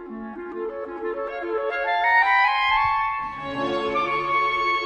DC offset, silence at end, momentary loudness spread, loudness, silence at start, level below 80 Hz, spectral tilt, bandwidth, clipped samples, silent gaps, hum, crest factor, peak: under 0.1%; 0 s; 13 LU; -22 LUFS; 0 s; -52 dBFS; -4.5 dB/octave; 9.6 kHz; under 0.1%; none; none; 16 dB; -8 dBFS